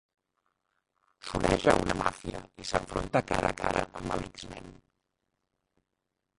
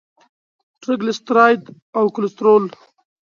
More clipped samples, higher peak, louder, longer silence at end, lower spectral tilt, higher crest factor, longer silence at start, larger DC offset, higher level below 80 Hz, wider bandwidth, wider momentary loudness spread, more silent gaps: neither; second, -4 dBFS vs 0 dBFS; second, -30 LUFS vs -17 LUFS; first, 1.65 s vs 0.6 s; about the same, -5 dB/octave vs -6 dB/octave; first, 28 dB vs 18 dB; first, 1.25 s vs 0.9 s; neither; first, -48 dBFS vs -72 dBFS; first, 11.5 kHz vs 7.2 kHz; first, 17 LU vs 13 LU; second, none vs 1.82-1.93 s